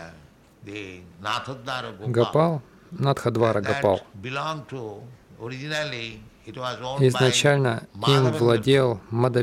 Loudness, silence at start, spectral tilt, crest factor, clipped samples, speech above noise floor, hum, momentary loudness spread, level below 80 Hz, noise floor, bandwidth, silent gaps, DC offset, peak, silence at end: -23 LUFS; 0 s; -5.5 dB/octave; 20 dB; under 0.1%; 28 dB; none; 18 LU; -58 dBFS; -51 dBFS; 14.5 kHz; none; under 0.1%; -4 dBFS; 0 s